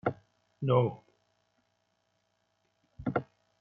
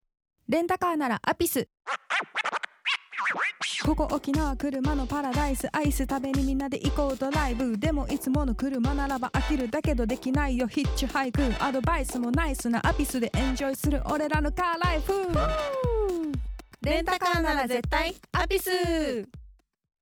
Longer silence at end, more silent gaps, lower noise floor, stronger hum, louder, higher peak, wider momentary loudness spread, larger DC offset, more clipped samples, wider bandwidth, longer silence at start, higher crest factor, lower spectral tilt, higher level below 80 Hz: about the same, 0.4 s vs 0.5 s; neither; first, -77 dBFS vs -54 dBFS; first, 60 Hz at -65 dBFS vs none; second, -32 LUFS vs -28 LUFS; second, -14 dBFS vs -10 dBFS; first, 21 LU vs 3 LU; neither; neither; second, 4.5 kHz vs 19.5 kHz; second, 0.05 s vs 0.5 s; about the same, 22 dB vs 18 dB; first, -7.5 dB/octave vs -5 dB/octave; second, -66 dBFS vs -34 dBFS